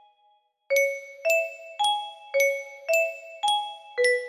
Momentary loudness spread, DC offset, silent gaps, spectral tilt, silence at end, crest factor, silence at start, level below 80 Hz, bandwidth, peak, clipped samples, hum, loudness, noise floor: 7 LU; under 0.1%; none; 2.5 dB/octave; 0 s; 16 dB; 0.7 s; -78 dBFS; 15 kHz; -12 dBFS; under 0.1%; none; -26 LUFS; -65 dBFS